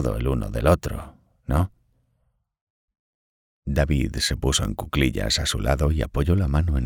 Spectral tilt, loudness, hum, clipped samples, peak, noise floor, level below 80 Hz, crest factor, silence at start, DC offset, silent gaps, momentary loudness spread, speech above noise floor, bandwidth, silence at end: -5 dB/octave; -23 LUFS; none; under 0.1%; -4 dBFS; -70 dBFS; -30 dBFS; 20 dB; 0 s; under 0.1%; 2.61-2.88 s, 2.99-3.62 s; 7 LU; 48 dB; 17 kHz; 0 s